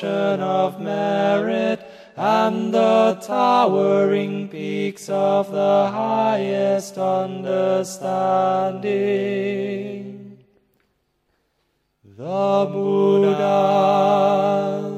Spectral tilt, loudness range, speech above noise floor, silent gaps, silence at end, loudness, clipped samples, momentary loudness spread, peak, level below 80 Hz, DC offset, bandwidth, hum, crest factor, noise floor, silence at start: -6 dB/octave; 8 LU; 50 dB; none; 0 s; -20 LUFS; under 0.1%; 10 LU; -4 dBFS; -72 dBFS; under 0.1%; 13.5 kHz; none; 16 dB; -69 dBFS; 0 s